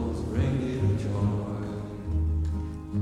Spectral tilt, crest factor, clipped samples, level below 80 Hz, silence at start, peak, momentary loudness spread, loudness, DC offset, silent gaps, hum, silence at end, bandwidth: -8.5 dB/octave; 14 dB; under 0.1%; -34 dBFS; 0 s; -14 dBFS; 7 LU; -29 LUFS; under 0.1%; none; none; 0 s; 10 kHz